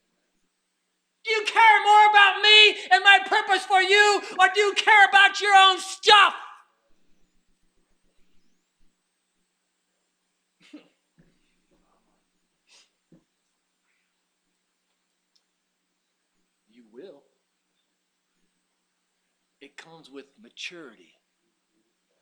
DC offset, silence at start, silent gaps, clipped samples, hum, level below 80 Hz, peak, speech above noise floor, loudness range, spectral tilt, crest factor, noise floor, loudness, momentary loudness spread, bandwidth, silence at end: under 0.1%; 1.25 s; none; under 0.1%; none; -78 dBFS; 0 dBFS; 56 dB; 6 LU; 1 dB/octave; 24 dB; -76 dBFS; -17 LUFS; 15 LU; 12 kHz; 1.55 s